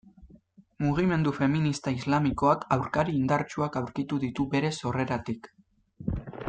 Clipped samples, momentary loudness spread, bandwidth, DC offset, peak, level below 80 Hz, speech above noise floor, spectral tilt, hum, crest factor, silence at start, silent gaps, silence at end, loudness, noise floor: under 0.1%; 9 LU; 9.2 kHz; under 0.1%; -10 dBFS; -50 dBFS; 30 dB; -7 dB/octave; none; 18 dB; 0.05 s; none; 0 s; -28 LUFS; -57 dBFS